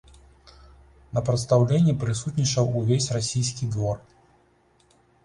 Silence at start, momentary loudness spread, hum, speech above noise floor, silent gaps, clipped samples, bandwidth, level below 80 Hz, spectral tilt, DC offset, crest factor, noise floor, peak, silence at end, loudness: 1.15 s; 8 LU; none; 39 dB; none; under 0.1%; 11 kHz; -50 dBFS; -6 dB/octave; under 0.1%; 18 dB; -62 dBFS; -6 dBFS; 1.25 s; -24 LUFS